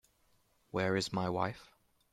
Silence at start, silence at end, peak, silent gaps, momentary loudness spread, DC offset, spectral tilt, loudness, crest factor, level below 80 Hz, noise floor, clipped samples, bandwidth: 0.75 s; 0.45 s; -18 dBFS; none; 8 LU; under 0.1%; -5 dB/octave; -35 LUFS; 20 dB; -70 dBFS; -72 dBFS; under 0.1%; 14 kHz